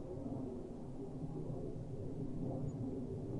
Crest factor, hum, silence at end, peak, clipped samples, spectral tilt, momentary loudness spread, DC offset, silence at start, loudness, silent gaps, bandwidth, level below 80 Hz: 12 dB; none; 0 s; -32 dBFS; under 0.1%; -10 dB/octave; 5 LU; under 0.1%; 0 s; -45 LUFS; none; 11 kHz; -54 dBFS